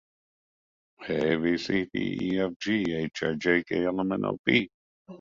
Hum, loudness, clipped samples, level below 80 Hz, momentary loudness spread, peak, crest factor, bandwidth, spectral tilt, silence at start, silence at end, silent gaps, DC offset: none; -27 LUFS; under 0.1%; -60 dBFS; 5 LU; -6 dBFS; 22 dB; 7.6 kHz; -6 dB/octave; 1 s; 0.05 s; 2.56-2.60 s, 4.39-4.44 s, 4.74-5.05 s; under 0.1%